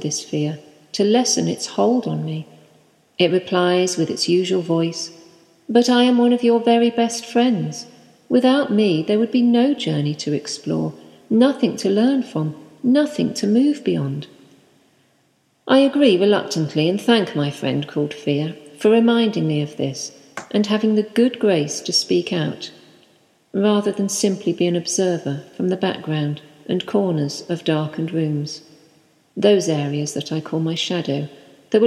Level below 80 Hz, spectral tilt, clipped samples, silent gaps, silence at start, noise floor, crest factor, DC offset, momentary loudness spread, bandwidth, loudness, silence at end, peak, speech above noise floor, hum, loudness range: -70 dBFS; -5 dB/octave; under 0.1%; none; 0 s; -62 dBFS; 18 dB; under 0.1%; 11 LU; 13 kHz; -19 LUFS; 0 s; -2 dBFS; 44 dB; none; 4 LU